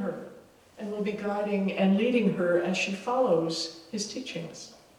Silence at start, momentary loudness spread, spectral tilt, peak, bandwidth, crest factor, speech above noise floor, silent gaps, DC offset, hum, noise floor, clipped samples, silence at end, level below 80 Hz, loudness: 0 s; 16 LU; -5.5 dB/octave; -12 dBFS; 12 kHz; 16 dB; 25 dB; none; under 0.1%; none; -53 dBFS; under 0.1%; 0.25 s; -70 dBFS; -28 LUFS